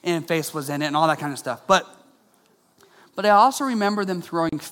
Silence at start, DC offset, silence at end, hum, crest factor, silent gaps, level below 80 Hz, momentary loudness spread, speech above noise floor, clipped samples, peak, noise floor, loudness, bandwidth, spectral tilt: 0.05 s; under 0.1%; 0 s; none; 20 dB; none; -62 dBFS; 11 LU; 39 dB; under 0.1%; -2 dBFS; -61 dBFS; -22 LUFS; 17.5 kHz; -4.5 dB/octave